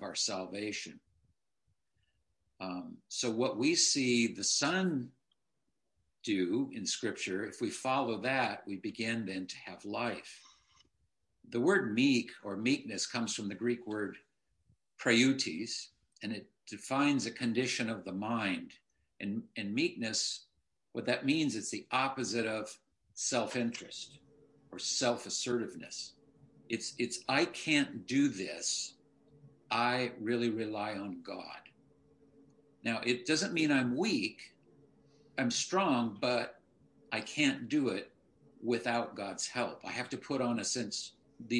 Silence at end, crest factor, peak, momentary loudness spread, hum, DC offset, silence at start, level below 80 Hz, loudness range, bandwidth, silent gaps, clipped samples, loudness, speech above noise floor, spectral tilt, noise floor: 0 s; 22 dB; -14 dBFS; 14 LU; none; under 0.1%; 0 s; -80 dBFS; 5 LU; 11.5 kHz; none; under 0.1%; -34 LUFS; 52 dB; -3 dB/octave; -86 dBFS